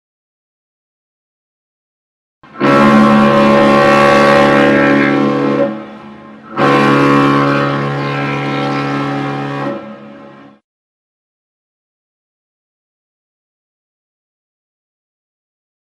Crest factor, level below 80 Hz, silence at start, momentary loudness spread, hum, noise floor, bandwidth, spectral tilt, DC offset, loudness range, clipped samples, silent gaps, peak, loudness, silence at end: 14 dB; -48 dBFS; 2.55 s; 12 LU; none; -37 dBFS; 12.5 kHz; -6.5 dB/octave; under 0.1%; 13 LU; under 0.1%; none; 0 dBFS; -11 LUFS; 5.65 s